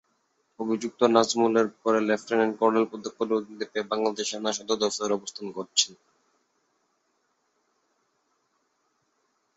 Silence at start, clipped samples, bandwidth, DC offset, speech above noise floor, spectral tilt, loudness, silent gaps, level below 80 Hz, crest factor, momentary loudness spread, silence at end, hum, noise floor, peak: 0.6 s; under 0.1%; 8.2 kHz; under 0.1%; 47 dB; -3 dB/octave; -26 LUFS; none; -74 dBFS; 22 dB; 10 LU; 3.65 s; none; -73 dBFS; -6 dBFS